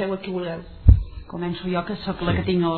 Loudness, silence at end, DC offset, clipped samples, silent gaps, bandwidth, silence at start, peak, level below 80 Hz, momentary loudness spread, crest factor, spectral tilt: -23 LUFS; 0 s; under 0.1%; under 0.1%; none; 4.5 kHz; 0 s; -2 dBFS; -26 dBFS; 13 LU; 20 dB; -11 dB/octave